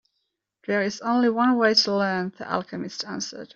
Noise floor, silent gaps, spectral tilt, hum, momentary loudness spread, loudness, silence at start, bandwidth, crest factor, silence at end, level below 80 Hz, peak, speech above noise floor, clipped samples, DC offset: -78 dBFS; none; -4 dB/octave; none; 13 LU; -23 LUFS; 0.7 s; 7.6 kHz; 18 dB; 0.1 s; -70 dBFS; -6 dBFS; 54 dB; under 0.1%; under 0.1%